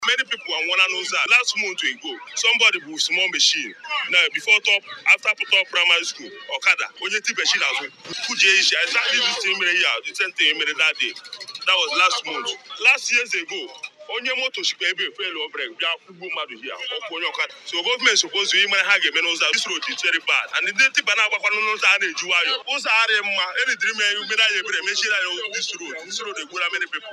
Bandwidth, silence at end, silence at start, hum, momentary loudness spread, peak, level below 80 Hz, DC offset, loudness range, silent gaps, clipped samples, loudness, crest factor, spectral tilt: 13.5 kHz; 0 s; 0 s; none; 12 LU; -2 dBFS; -84 dBFS; under 0.1%; 5 LU; none; under 0.1%; -19 LUFS; 18 dB; 1.5 dB/octave